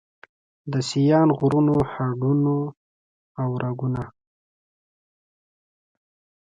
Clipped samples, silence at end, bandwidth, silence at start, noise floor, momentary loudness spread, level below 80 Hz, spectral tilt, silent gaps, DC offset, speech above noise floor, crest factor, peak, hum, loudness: under 0.1%; 2.4 s; 9.2 kHz; 0.65 s; under -90 dBFS; 14 LU; -54 dBFS; -7.5 dB/octave; 2.77-3.35 s; under 0.1%; over 69 dB; 18 dB; -6 dBFS; none; -22 LUFS